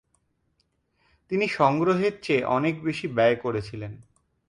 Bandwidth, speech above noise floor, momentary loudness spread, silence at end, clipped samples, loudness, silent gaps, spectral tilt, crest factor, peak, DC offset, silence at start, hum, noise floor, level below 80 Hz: 11 kHz; 47 dB; 11 LU; 0.5 s; under 0.1%; -24 LUFS; none; -7 dB/octave; 20 dB; -6 dBFS; under 0.1%; 1.3 s; none; -72 dBFS; -60 dBFS